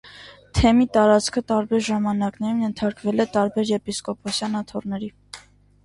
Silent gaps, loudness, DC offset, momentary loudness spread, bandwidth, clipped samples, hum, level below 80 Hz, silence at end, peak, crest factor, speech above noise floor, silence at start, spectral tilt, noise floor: none; -22 LUFS; under 0.1%; 14 LU; 11.5 kHz; under 0.1%; 50 Hz at -55 dBFS; -40 dBFS; 0.45 s; -4 dBFS; 18 dB; 27 dB; 0.05 s; -5.5 dB/octave; -48 dBFS